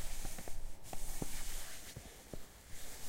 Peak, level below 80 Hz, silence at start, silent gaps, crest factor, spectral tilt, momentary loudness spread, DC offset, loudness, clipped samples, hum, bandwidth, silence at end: -24 dBFS; -44 dBFS; 0 s; none; 14 dB; -3 dB/octave; 9 LU; under 0.1%; -48 LUFS; under 0.1%; none; 16 kHz; 0 s